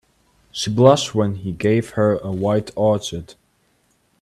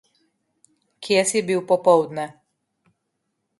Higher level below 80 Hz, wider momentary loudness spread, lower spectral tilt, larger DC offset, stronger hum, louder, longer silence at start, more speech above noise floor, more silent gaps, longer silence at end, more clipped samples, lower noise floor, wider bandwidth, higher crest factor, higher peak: first, -52 dBFS vs -72 dBFS; second, 13 LU vs 16 LU; first, -6 dB/octave vs -3.5 dB/octave; neither; neither; about the same, -19 LUFS vs -20 LUFS; second, 0.55 s vs 1 s; second, 45 dB vs 57 dB; neither; second, 0.9 s vs 1.3 s; neither; second, -63 dBFS vs -76 dBFS; first, 13.5 kHz vs 11.5 kHz; about the same, 20 dB vs 20 dB; first, 0 dBFS vs -4 dBFS